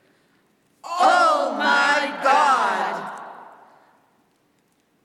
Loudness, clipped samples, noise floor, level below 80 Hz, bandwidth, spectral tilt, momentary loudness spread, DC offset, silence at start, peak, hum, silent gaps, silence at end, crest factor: -19 LUFS; under 0.1%; -65 dBFS; -86 dBFS; 14 kHz; -2 dB/octave; 17 LU; under 0.1%; 0.85 s; -4 dBFS; none; none; 1.6 s; 18 dB